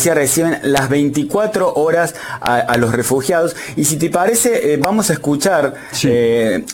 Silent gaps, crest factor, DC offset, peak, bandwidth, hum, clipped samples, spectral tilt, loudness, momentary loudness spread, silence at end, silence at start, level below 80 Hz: none; 14 dB; under 0.1%; 0 dBFS; 17 kHz; none; under 0.1%; -4 dB/octave; -15 LUFS; 4 LU; 0 s; 0 s; -48 dBFS